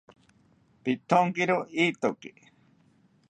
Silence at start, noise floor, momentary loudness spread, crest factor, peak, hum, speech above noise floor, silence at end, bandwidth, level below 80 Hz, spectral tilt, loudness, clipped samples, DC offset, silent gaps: 0.85 s; -63 dBFS; 14 LU; 22 dB; -8 dBFS; none; 37 dB; 1 s; 9.2 kHz; -76 dBFS; -5.5 dB/octave; -27 LUFS; under 0.1%; under 0.1%; none